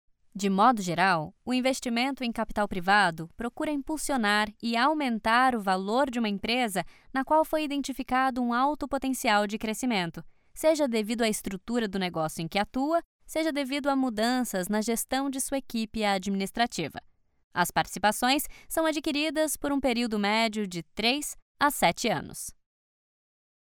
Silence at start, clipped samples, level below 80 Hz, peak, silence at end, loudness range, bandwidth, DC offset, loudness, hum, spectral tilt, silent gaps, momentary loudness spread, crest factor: 0.35 s; under 0.1%; -54 dBFS; -10 dBFS; 1.2 s; 3 LU; 19.5 kHz; under 0.1%; -27 LUFS; none; -3.5 dB/octave; 13.05-13.19 s, 17.44-17.51 s, 21.42-21.55 s; 8 LU; 18 dB